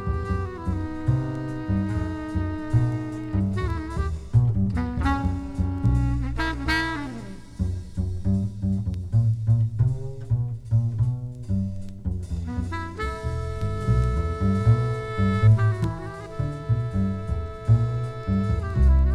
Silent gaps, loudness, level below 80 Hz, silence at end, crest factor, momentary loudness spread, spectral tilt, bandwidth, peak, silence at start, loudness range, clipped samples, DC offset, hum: none; -26 LUFS; -30 dBFS; 0 s; 16 dB; 9 LU; -8 dB/octave; 10 kHz; -8 dBFS; 0 s; 4 LU; under 0.1%; under 0.1%; none